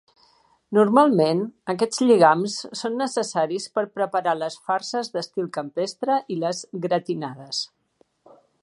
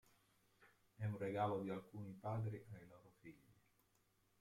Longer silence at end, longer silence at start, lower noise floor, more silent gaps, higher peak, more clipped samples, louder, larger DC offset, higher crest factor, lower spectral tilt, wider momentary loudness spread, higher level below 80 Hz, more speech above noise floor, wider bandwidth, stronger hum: about the same, 0.95 s vs 0.9 s; about the same, 0.7 s vs 0.6 s; second, -65 dBFS vs -80 dBFS; neither; first, -2 dBFS vs -28 dBFS; neither; first, -23 LUFS vs -46 LUFS; neither; about the same, 22 dB vs 20 dB; second, -5 dB/octave vs -8.5 dB/octave; second, 12 LU vs 21 LU; first, -74 dBFS vs -80 dBFS; first, 42 dB vs 34 dB; second, 11.5 kHz vs 14.5 kHz; neither